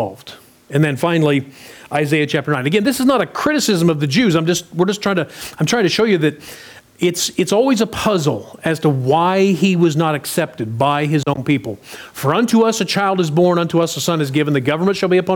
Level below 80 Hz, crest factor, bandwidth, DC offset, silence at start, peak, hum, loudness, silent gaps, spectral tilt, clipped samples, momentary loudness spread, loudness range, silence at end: -54 dBFS; 14 dB; over 20 kHz; under 0.1%; 0 s; -4 dBFS; none; -16 LUFS; none; -5 dB/octave; under 0.1%; 8 LU; 2 LU; 0 s